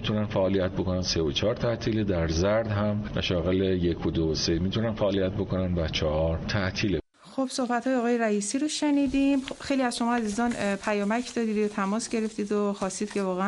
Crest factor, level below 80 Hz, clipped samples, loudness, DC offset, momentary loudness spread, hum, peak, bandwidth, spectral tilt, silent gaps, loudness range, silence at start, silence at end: 14 dB; -44 dBFS; under 0.1%; -27 LUFS; under 0.1%; 4 LU; none; -14 dBFS; 11.5 kHz; -5.5 dB/octave; none; 2 LU; 0 s; 0 s